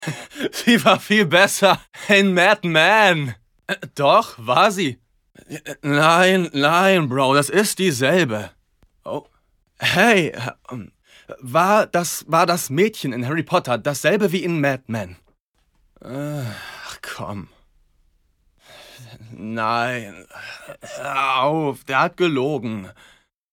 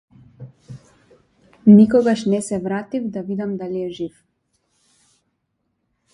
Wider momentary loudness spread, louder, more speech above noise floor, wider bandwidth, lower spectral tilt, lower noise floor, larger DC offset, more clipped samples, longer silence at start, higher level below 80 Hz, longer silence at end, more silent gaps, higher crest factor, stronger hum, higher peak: about the same, 19 LU vs 18 LU; about the same, -18 LUFS vs -18 LUFS; second, 45 dB vs 56 dB; first, 19 kHz vs 10.5 kHz; second, -4 dB/octave vs -7.5 dB/octave; second, -64 dBFS vs -72 dBFS; neither; neither; second, 0 s vs 0.4 s; about the same, -60 dBFS vs -58 dBFS; second, 0.65 s vs 2.05 s; first, 15.40-15.54 s vs none; about the same, 18 dB vs 20 dB; neither; about the same, -2 dBFS vs 0 dBFS